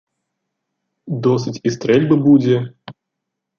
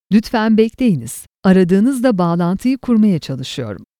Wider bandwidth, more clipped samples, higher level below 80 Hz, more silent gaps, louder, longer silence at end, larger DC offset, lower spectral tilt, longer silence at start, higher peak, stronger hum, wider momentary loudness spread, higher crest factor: second, 7 kHz vs 15 kHz; neither; second, -60 dBFS vs -46 dBFS; neither; about the same, -16 LUFS vs -15 LUFS; first, 0.65 s vs 0.15 s; neither; about the same, -7.5 dB/octave vs -7 dB/octave; first, 1.05 s vs 0.1 s; about the same, -2 dBFS vs 0 dBFS; neither; about the same, 11 LU vs 11 LU; about the same, 16 dB vs 14 dB